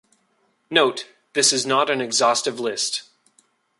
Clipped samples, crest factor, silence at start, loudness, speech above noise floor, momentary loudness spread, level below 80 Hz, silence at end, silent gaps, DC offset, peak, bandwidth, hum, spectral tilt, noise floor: under 0.1%; 20 dB; 0.7 s; -20 LUFS; 46 dB; 9 LU; -72 dBFS; 0.8 s; none; under 0.1%; -2 dBFS; 11.5 kHz; none; -1 dB/octave; -66 dBFS